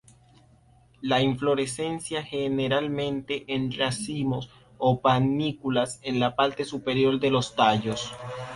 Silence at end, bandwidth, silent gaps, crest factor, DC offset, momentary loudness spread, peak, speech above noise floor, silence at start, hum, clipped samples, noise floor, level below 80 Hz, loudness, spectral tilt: 0 s; 11.5 kHz; none; 20 dB; under 0.1%; 9 LU; -6 dBFS; 32 dB; 1 s; none; under 0.1%; -58 dBFS; -58 dBFS; -26 LUFS; -5.5 dB/octave